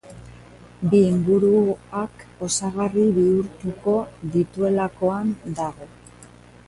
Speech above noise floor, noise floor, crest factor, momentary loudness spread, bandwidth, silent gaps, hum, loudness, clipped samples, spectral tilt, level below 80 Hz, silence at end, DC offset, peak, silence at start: 26 dB; -47 dBFS; 16 dB; 12 LU; 11.5 kHz; none; 60 Hz at -40 dBFS; -22 LUFS; under 0.1%; -6.5 dB/octave; -52 dBFS; 0.4 s; under 0.1%; -6 dBFS; 0.05 s